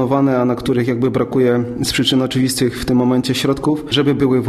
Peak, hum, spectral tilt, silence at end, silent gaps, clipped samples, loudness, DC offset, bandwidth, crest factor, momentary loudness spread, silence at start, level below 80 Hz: -2 dBFS; none; -5.5 dB/octave; 0 s; none; under 0.1%; -16 LUFS; under 0.1%; 13.5 kHz; 14 dB; 3 LU; 0 s; -40 dBFS